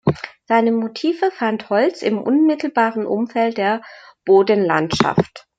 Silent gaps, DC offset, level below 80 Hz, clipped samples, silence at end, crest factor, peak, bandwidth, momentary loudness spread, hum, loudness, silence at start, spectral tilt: none; under 0.1%; -56 dBFS; under 0.1%; 0.2 s; 18 dB; 0 dBFS; 7.8 kHz; 6 LU; none; -18 LUFS; 0.05 s; -6.5 dB/octave